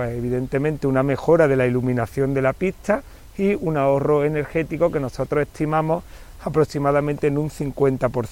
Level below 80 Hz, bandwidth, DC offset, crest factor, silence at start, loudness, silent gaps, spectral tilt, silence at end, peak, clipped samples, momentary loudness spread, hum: -42 dBFS; 16.5 kHz; under 0.1%; 16 dB; 0 s; -21 LUFS; none; -8 dB/octave; 0 s; -6 dBFS; under 0.1%; 7 LU; none